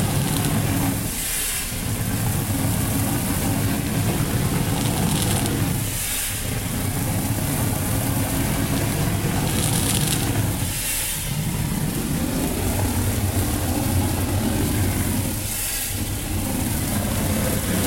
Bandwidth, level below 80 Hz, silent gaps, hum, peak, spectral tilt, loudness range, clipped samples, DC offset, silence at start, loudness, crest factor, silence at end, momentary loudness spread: 16.5 kHz; -34 dBFS; none; none; -2 dBFS; -4.5 dB/octave; 1 LU; under 0.1%; under 0.1%; 0 s; -22 LUFS; 20 dB; 0 s; 3 LU